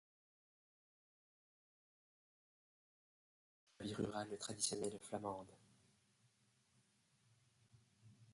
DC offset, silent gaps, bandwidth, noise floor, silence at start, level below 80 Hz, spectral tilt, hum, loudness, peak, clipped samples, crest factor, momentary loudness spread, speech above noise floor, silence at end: under 0.1%; none; 11.5 kHz; -78 dBFS; 3.8 s; -80 dBFS; -3.5 dB/octave; none; -45 LUFS; -26 dBFS; under 0.1%; 28 dB; 11 LU; 33 dB; 0 s